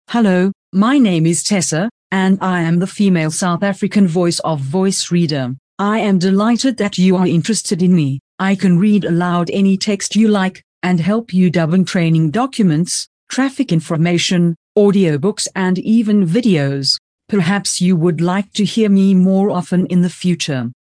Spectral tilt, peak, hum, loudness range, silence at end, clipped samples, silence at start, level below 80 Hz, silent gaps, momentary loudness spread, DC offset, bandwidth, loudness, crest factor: -5.5 dB/octave; -2 dBFS; none; 1 LU; 0.1 s; under 0.1%; 0.1 s; -58 dBFS; 0.55-0.72 s, 1.91-2.10 s, 5.59-5.77 s, 8.20-8.38 s, 10.64-10.81 s, 13.07-13.27 s, 14.56-14.75 s, 16.99-17.18 s; 6 LU; under 0.1%; 10.5 kHz; -15 LUFS; 12 dB